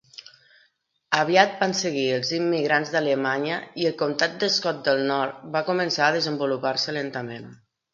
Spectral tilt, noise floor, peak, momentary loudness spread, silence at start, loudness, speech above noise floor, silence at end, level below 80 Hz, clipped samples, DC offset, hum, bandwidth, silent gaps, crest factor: -4 dB/octave; -67 dBFS; 0 dBFS; 8 LU; 1.1 s; -23 LUFS; 43 dB; 0.4 s; -72 dBFS; under 0.1%; under 0.1%; none; 7.6 kHz; none; 24 dB